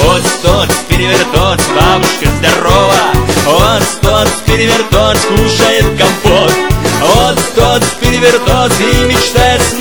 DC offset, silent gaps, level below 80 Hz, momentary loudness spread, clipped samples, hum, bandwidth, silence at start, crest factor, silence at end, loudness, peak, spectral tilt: 3%; none; -20 dBFS; 2 LU; 0.4%; none; over 20 kHz; 0 s; 8 dB; 0 s; -8 LUFS; 0 dBFS; -4 dB/octave